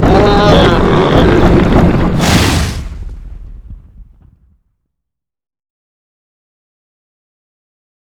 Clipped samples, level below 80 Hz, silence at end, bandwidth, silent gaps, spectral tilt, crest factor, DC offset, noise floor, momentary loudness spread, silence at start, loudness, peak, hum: 0.7%; -20 dBFS; 4.15 s; 19.5 kHz; none; -6 dB/octave; 12 dB; under 0.1%; -80 dBFS; 17 LU; 0 s; -9 LUFS; 0 dBFS; none